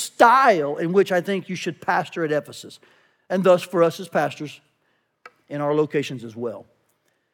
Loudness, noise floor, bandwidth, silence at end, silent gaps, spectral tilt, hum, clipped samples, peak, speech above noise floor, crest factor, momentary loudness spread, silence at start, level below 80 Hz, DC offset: -21 LUFS; -69 dBFS; 18 kHz; 0.7 s; none; -5 dB/octave; none; under 0.1%; -2 dBFS; 48 dB; 20 dB; 19 LU; 0 s; -82 dBFS; under 0.1%